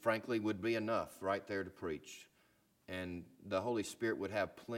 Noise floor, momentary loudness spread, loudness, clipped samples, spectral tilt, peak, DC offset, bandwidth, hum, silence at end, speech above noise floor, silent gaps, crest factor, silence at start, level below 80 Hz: -74 dBFS; 10 LU; -40 LUFS; under 0.1%; -5 dB/octave; -18 dBFS; under 0.1%; 16.5 kHz; none; 0 s; 34 dB; none; 22 dB; 0 s; -72 dBFS